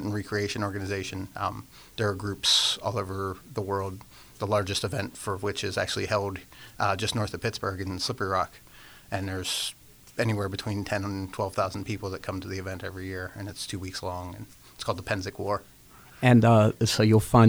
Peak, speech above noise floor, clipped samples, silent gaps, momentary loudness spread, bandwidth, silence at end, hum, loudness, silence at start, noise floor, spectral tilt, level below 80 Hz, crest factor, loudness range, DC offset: -6 dBFS; 24 dB; under 0.1%; none; 15 LU; over 20 kHz; 0 s; none; -28 LUFS; 0 s; -51 dBFS; -5 dB/octave; -54 dBFS; 22 dB; 8 LU; under 0.1%